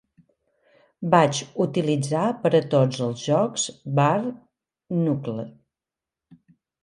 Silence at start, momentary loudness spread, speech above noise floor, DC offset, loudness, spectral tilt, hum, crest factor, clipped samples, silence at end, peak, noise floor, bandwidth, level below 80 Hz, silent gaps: 1 s; 12 LU; 67 dB; under 0.1%; -23 LUFS; -5.5 dB/octave; none; 22 dB; under 0.1%; 1.35 s; -2 dBFS; -89 dBFS; 11.5 kHz; -68 dBFS; none